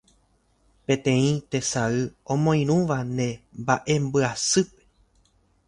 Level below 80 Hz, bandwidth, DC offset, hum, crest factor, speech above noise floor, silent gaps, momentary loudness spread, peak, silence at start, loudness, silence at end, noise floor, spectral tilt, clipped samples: -56 dBFS; 11.5 kHz; under 0.1%; none; 20 dB; 41 dB; none; 7 LU; -4 dBFS; 0.9 s; -24 LUFS; 1 s; -65 dBFS; -5 dB/octave; under 0.1%